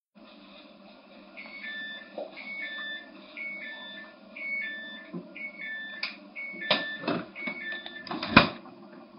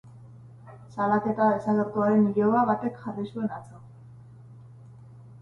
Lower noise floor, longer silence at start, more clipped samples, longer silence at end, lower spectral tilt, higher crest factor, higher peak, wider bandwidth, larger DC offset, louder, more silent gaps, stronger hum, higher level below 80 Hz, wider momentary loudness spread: first, -53 dBFS vs -48 dBFS; about the same, 0.15 s vs 0.05 s; neither; about the same, 0 s vs 0 s; second, -2 dB/octave vs -9.5 dB/octave; first, 32 dB vs 16 dB; first, -2 dBFS vs -10 dBFS; about the same, 5.4 kHz vs 5.8 kHz; neither; second, -31 LUFS vs -25 LUFS; neither; neither; about the same, -60 dBFS vs -64 dBFS; first, 22 LU vs 13 LU